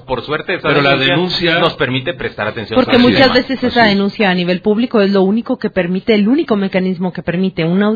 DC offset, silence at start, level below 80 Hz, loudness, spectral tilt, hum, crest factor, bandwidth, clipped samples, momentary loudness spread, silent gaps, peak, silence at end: under 0.1%; 0.1 s; -44 dBFS; -13 LUFS; -7.5 dB/octave; none; 14 dB; 5.4 kHz; under 0.1%; 8 LU; none; 0 dBFS; 0 s